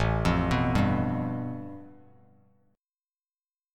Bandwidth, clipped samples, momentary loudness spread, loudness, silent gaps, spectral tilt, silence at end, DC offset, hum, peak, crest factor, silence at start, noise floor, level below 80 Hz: 12.5 kHz; under 0.1%; 16 LU; -27 LUFS; none; -7.5 dB/octave; 1.8 s; under 0.1%; none; -12 dBFS; 18 dB; 0 s; under -90 dBFS; -40 dBFS